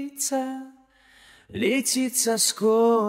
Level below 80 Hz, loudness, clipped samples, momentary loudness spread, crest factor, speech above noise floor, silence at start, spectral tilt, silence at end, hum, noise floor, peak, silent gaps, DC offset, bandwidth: -66 dBFS; -23 LUFS; under 0.1%; 13 LU; 16 dB; 33 dB; 0 s; -2.5 dB/octave; 0 s; none; -56 dBFS; -8 dBFS; none; under 0.1%; 16 kHz